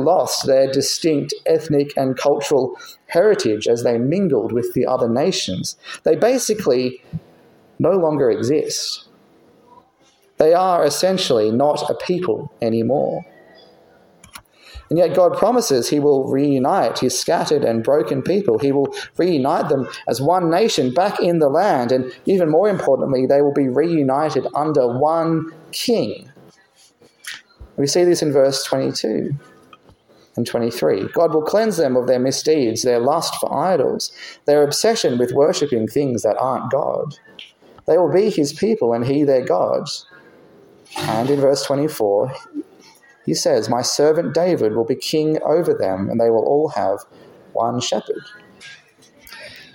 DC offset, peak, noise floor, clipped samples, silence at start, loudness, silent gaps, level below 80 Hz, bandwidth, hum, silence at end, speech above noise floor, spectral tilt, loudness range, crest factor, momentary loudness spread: under 0.1%; 0 dBFS; -56 dBFS; under 0.1%; 0 s; -18 LUFS; none; -58 dBFS; 17 kHz; none; 0.1 s; 39 dB; -5 dB/octave; 4 LU; 18 dB; 10 LU